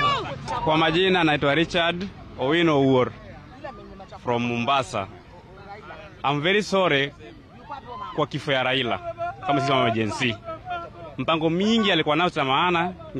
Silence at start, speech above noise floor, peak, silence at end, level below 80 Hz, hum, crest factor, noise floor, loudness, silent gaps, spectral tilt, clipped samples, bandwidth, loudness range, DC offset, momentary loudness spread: 0 s; 22 dB; -10 dBFS; 0 s; -52 dBFS; none; 14 dB; -44 dBFS; -23 LUFS; none; -5.5 dB/octave; under 0.1%; 10.5 kHz; 5 LU; under 0.1%; 20 LU